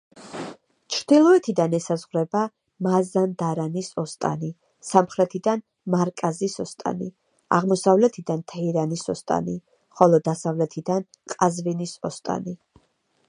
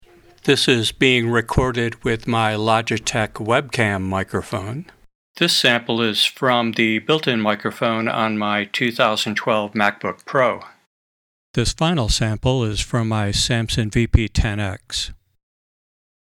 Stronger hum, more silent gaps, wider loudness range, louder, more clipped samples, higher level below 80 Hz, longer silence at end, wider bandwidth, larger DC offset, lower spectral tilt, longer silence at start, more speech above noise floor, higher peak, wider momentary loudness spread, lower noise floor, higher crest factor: neither; second, none vs 5.15-5.34 s, 10.87-11.54 s; about the same, 3 LU vs 3 LU; second, -23 LUFS vs -19 LUFS; neither; second, -66 dBFS vs -34 dBFS; second, 0.75 s vs 1.25 s; second, 11 kHz vs 18 kHz; neither; first, -6 dB/octave vs -4.5 dB/octave; second, 0.15 s vs 0.45 s; second, 44 dB vs over 71 dB; about the same, 0 dBFS vs 0 dBFS; first, 15 LU vs 9 LU; second, -67 dBFS vs under -90 dBFS; about the same, 22 dB vs 20 dB